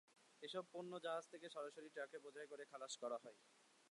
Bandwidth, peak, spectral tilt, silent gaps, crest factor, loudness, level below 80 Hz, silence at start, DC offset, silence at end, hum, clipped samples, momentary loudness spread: 11.5 kHz; -36 dBFS; -3 dB/octave; none; 18 dB; -52 LUFS; under -90 dBFS; 0.1 s; under 0.1%; 0 s; none; under 0.1%; 7 LU